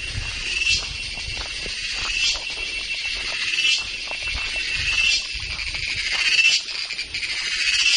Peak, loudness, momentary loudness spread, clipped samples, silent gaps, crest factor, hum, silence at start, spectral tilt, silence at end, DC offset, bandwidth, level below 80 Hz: -6 dBFS; -21 LUFS; 9 LU; under 0.1%; none; 18 dB; none; 0 s; 0.5 dB/octave; 0 s; under 0.1%; 11.5 kHz; -40 dBFS